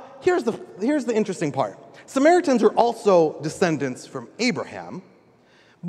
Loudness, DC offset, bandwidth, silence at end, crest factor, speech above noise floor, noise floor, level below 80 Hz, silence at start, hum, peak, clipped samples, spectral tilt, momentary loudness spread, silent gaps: -22 LUFS; under 0.1%; 12.5 kHz; 0 s; 20 dB; 34 dB; -56 dBFS; -68 dBFS; 0 s; none; -4 dBFS; under 0.1%; -5.5 dB/octave; 16 LU; none